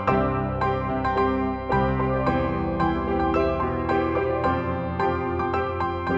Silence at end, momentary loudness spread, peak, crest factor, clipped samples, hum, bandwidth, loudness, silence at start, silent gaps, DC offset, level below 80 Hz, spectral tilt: 0 s; 3 LU; -8 dBFS; 16 dB; under 0.1%; none; 8 kHz; -24 LUFS; 0 s; none; under 0.1%; -36 dBFS; -9 dB/octave